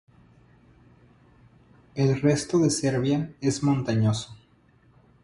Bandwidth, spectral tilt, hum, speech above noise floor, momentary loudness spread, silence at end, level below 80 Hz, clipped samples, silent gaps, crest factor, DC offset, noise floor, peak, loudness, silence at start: 11.5 kHz; -6 dB/octave; none; 36 dB; 7 LU; 0.9 s; -56 dBFS; under 0.1%; none; 18 dB; under 0.1%; -59 dBFS; -10 dBFS; -24 LUFS; 1.95 s